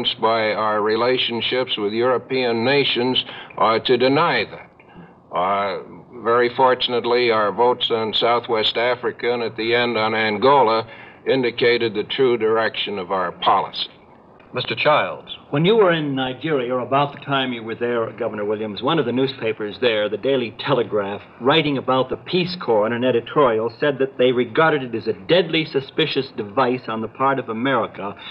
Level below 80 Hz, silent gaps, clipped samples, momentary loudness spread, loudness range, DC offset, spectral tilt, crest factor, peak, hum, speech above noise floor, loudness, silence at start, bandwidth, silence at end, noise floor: -62 dBFS; none; under 0.1%; 8 LU; 3 LU; under 0.1%; -7.5 dB/octave; 18 dB; -2 dBFS; none; 28 dB; -20 LUFS; 0 s; 5.6 kHz; 0 s; -47 dBFS